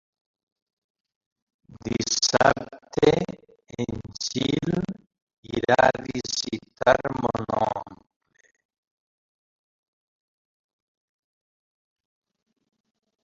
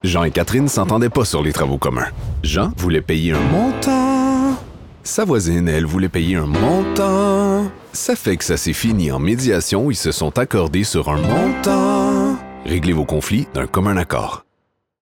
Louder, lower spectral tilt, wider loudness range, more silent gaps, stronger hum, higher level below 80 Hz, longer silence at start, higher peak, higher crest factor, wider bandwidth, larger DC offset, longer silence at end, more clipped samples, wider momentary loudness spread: second, -24 LUFS vs -18 LUFS; second, -4 dB/octave vs -5.5 dB/octave; first, 6 LU vs 1 LU; first, 5.22-5.27 s, 5.38-5.43 s vs none; neither; second, -54 dBFS vs -32 dBFS; first, 1.7 s vs 0.05 s; about the same, -2 dBFS vs -4 dBFS; first, 26 dB vs 14 dB; second, 7.8 kHz vs 17.5 kHz; second, under 0.1% vs 0.2%; first, 5.3 s vs 0.6 s; neither; first, 15 LU vs 6 LU